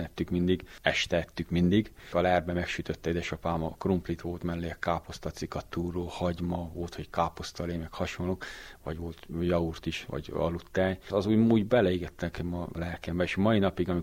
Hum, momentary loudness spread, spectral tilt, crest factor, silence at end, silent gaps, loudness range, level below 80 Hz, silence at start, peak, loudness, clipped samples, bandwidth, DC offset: none; 11 LU; -6.5 dB/octave; 22 dB; 0 s; none; 6 LU; -48 dBFS; 0 s; -6 dBFS; -30 LUFS; under 0.1%; 16 kHz; under 0.1%